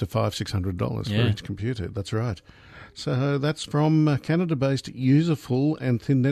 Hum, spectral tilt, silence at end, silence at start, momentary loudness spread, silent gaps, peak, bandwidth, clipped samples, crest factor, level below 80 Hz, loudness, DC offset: none; -7 dB/octave; 0 s; 0 s; 9 LU; none; -10 dBFS; 13.5 kHz; under 0.1%; 14 dB; -52 dBFS; -25 LUFS; under 0.1%